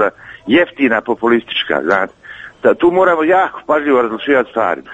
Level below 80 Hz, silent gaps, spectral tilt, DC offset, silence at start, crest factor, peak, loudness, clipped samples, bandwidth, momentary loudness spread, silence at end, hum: -52 dBFS; none; -6 dB/octave; under 0.1%; 0 s; 14 dB; 0 dBFS; -14 LUFS; under 0.1%; 8 kHz; 6 LU; 0 s; none